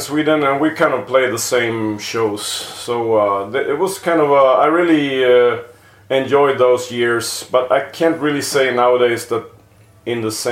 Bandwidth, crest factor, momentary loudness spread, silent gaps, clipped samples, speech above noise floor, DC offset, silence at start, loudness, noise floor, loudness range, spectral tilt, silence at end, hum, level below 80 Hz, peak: 16.5 kHz; 16 dB; 9 LU; none; under 0.1%; 31 dB; under 0.1%; 0 s; -16 LUFS; -47 dBFS; 3 LU; -4 dB/octave; 0 s; none; -60 dBFS; 0 dBFS